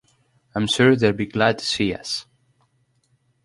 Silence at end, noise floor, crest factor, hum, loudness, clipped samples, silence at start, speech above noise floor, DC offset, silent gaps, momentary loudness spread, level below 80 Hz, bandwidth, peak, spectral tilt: 1.25 s; -65 dBFS; 20 dB; none; -21 LUFS; under 0.1%; 0.55 s; 45 dB; under 0.1%; none; 12 LU; -54 dBFS; 11.5 kHz; -4 dBFS; -5 dB/octave